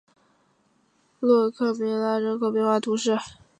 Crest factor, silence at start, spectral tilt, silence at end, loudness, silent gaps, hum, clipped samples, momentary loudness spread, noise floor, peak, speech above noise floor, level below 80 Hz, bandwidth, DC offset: 16 dB; 1.2 s; -5 dB/octave; 0.25 s; -24 LUFS; none; none; under 0.1%; 5 LU; -66 dBFS; -8 dBFS; 43 dB; -70 dBFS; 10.5 kHz; under 0.1%